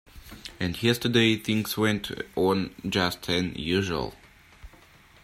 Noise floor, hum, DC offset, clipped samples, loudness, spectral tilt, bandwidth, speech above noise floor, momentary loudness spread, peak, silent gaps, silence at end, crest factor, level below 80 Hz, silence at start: -54 dBFS; none; under 0.1%; under 0.1%; -26 LUFS; -5 dB/octave; 16 kHz; 28 dB; 11 LU; -8 dBFS; none; 0.55 s; 20 dB; -52 dBFS; 0.15 s